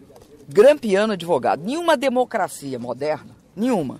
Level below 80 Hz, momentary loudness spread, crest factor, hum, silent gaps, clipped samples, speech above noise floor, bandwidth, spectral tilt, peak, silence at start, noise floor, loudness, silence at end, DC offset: -60 dBFS; 12 LU; 16 dB; none; none; under 0.1%; 26 dB; 15.5 kHz; -5 dB/octave; -4 dBFS; 0.5 s; -45 dBFS; -20 LUFS; 0 s; under 0.1%